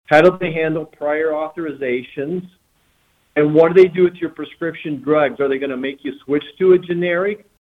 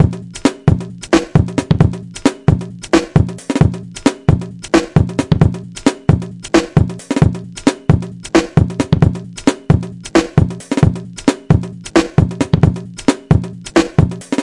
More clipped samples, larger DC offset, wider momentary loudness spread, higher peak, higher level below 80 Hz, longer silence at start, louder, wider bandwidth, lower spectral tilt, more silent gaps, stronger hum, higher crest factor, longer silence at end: neither; neither; first, 14 LU vs 5 LU; about the same, -2 dBFS vs 0 dBFS; second, -60 dBFS vs -30 dBFS; about the same, 0.1 s vs 0 s; second, -18 LUFS vs -15 LUFS; second, 6.6 kHz vs 11.5 kHz; first, -8 dB/octave vs -6.5 dB/octave; neither; neither; about the same, 16 dB vs 14 dB; first, 0.25 s vs 0 s